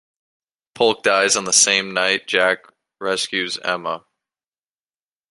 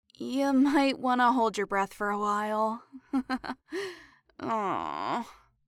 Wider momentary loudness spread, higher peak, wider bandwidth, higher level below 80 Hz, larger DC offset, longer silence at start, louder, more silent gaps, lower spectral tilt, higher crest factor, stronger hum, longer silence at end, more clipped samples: about the same, 13 LU vs 13 LU; first, -2 dBFS vs -12 dBFS; second, 11.5 kHz vs 14 kHz; about the same, -68 dBFS vs -64 dBFS; neither; first, 0.75 s vs 0.2 s; first, -18 LUFS vs -29 LUFS; neither; second, -0.5 dB/octave vs -4.5 dB/octave; about the same, 20 dB vs 16 dB; neither; first, 1.3 s vs 0.35 s; neither